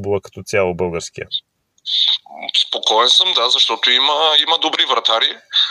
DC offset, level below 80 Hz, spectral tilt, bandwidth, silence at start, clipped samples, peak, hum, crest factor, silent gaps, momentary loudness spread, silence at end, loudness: under 0.1%; -56 dBFS; -2 dB/octave; 13 kHz; 0 s; under 0.1%; 0 dBFS; none; 16 dB; none; 13 LU; 0 s; -14 LUFS